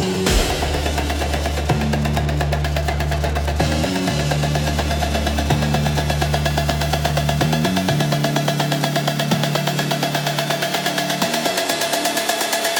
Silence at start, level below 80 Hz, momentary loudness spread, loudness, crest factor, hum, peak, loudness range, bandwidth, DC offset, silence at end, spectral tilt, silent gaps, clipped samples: 0 s; -28 dBFS; 3 LU; -19 LUFS; 18 dB; none; -2 dBFS; 1 LU; 19 kHz; under 0.1%; 0 s; -4.5 dB/octave; none; under 0.1%